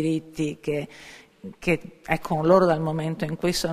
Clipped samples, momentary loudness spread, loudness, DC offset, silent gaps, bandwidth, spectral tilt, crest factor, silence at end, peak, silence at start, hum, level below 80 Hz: under 0.1%; 23 LU; -24 LUFS; under 0.1%; none; 15.5 kHz; -6 dB/octave; 22 dB; 0 s; -4 dBFS; 0 s; none; -50 dBFS